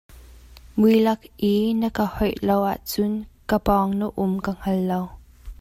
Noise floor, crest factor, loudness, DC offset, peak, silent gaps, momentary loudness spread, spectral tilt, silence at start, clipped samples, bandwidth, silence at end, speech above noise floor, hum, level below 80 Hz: -46 dBFS; 16 dB; -22 LUFS; under 0.1%; -6 dBFS; none; 8 LU; -7 dB/octave; 0.1 s; under 0.1%; 16 kHz; 0.05 s; 24 dB; none; -42 dBFS